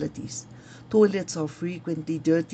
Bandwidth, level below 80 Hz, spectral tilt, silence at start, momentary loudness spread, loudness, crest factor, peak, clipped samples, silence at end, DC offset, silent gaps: 9 kHz; -62 dBFS; -6 dB/octave; 0 s; 16 LU; -26 LUFS; 18 dB; -8 dBFS; under 0.1%; 0 s; under 0.1%; none